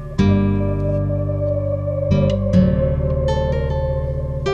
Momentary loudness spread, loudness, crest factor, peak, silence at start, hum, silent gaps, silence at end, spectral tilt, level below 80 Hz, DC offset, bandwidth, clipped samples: 6 LU; -19 LUFS; 14 dB; -4 dBFS; 0 s; none; none; 0 s; -9 dB/octave; -28 dBFS; under 0.1%; 7.2 kHz; under 0.1%